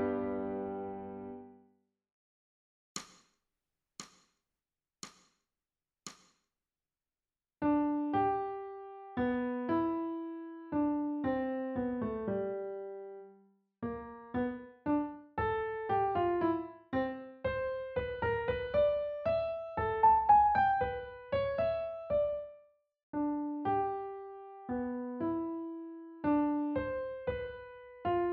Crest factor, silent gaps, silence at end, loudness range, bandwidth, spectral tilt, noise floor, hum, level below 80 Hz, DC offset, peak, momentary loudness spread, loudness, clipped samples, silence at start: 20 dB; 2.12-2.95 s, 23.03-23.13 s; 0 s; 22 LU; 8 kHz; -5.5 dB/octave; under -90 dBFS; none; -58 dBFS; under 0.1%; -14 dBFS; 17 LU; -34 LUFS; under 0.1%; 0 s